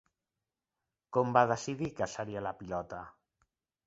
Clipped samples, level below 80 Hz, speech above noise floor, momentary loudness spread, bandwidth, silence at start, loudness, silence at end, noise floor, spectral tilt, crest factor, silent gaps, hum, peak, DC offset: under 0.1%; -64 dBFS; over 57 dB; 16 LU; 7.6 kHz; 1.1 s; -33 LUFS; 0.75 s; under -90 dBFS; -5.5 dB/octave; 24 dB; none; none; -10 dBFS; under 0.1%